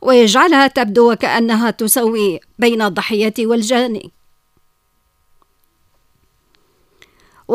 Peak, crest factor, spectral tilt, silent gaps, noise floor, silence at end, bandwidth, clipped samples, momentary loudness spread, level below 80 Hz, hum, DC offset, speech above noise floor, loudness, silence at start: 0 dBFS; 16 dB; -3.5 dB/octave; none; -61 dBFS; 0 s; 16 kHz; under 0.1%; 7 LU; -58 dBFS; none; under 0.1%; 48 dB; -14 LUFS; 0 s